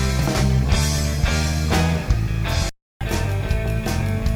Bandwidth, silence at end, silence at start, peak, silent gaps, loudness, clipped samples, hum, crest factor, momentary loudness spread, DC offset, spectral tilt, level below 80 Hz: 19 kHz; 0 s; 0 s; -6 dBFS; 2.82-3.00 s; -21 LUFS; under 0.1%; none; 14 dB; 5 LU; under 0.1%; -5 dB/octave; -24 dBFS